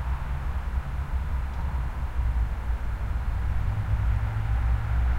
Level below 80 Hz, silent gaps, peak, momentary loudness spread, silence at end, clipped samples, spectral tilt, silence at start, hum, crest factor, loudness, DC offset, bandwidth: -28 dBFS; none; -14 dBFS; 5 LU; 0 s; under 0.1%; -7.5 dB/octave; 0 s; none; 12 dB; -30 LUFS; under 0.1%; 5.2 kHz